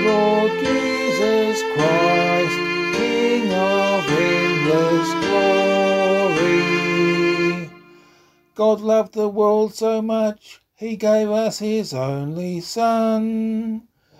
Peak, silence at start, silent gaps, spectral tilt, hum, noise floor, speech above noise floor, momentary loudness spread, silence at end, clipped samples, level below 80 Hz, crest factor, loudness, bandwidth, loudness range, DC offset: -4 dBFS; 0 s; none; -5 dB/octave; none; -55 dBFS; 35 dB; 8 LU; 0.4 s; under 0.1%; -58 dBFS; 14 dB; -19 LUFS; 15.5 kHz; 4 LU; under 0.1%